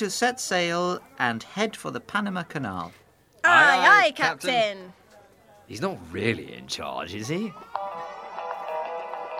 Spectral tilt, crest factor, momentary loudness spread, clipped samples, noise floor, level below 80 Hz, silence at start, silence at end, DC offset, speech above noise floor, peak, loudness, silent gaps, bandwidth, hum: -3.5 dB/octave; 24 dB; 19 LU; under 0.1%; -54 dBFS; -68 dBFS; 0 s; 0 s; under 0.1%; 30 dB; -2 dBFS; -24 LUFS; none; 16 kHz; none